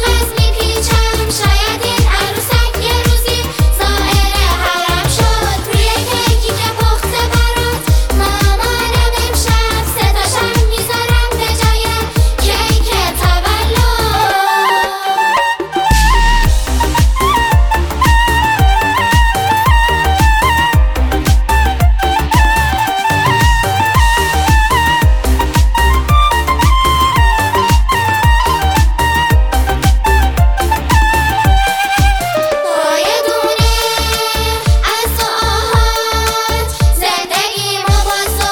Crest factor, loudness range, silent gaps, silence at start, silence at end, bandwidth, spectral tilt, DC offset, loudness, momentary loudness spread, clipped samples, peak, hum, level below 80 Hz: 12 dB; 2 LU; none; 0 s; 0 s; over 20 kHz; -4 dB/octave; under 0.1%; -12 LUFS; 3 LU; under 0.1%; 0 dBFS; none; -14 dBFS